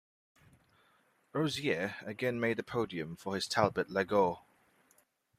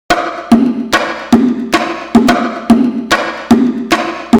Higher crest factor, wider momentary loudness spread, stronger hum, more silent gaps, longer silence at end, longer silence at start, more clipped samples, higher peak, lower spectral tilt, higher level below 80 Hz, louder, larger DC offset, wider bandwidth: first, 24 dB vs 12 dB; first, 8 LU vs 4 LU; neither; neither; first, 1 s vs 0 s; first, 1.35 s vs 0.1 s; second, under 0.1% vs 0.2%; second, -12 dBFS vs 0 dBFS; about the same, -5 dB/octave vs -4.5 dB/octave; second, -70 dBFS vs -40 dBFS; second, -34 LUFS vs -12 LUFS; neither; second, 15 kHz vs 17.5 kHz